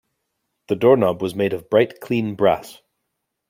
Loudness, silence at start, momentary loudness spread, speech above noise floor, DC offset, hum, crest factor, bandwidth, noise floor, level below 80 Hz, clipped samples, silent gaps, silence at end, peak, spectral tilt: -19 LUFS; 0.7 s; 8 LU; 59 dB; under 0.1%; none; 18 dB; 16.5 kHz; -77 dBFS; -60 dBFS; under 0.1%; none; 0.8 s; -2 dBFS; -7 dB/octave